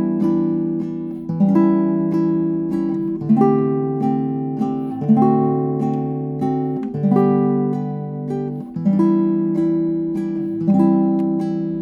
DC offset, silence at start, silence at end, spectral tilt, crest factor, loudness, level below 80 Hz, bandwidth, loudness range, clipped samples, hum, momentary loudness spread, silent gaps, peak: under 0.1%; 0 s; 0 s; -11 dB/octave; 16 dB; -19 LUFS; -56 dBFS; 4.9 kHz; 2 LU; under 0.1%; none; 9 LU; none; -2 dBFS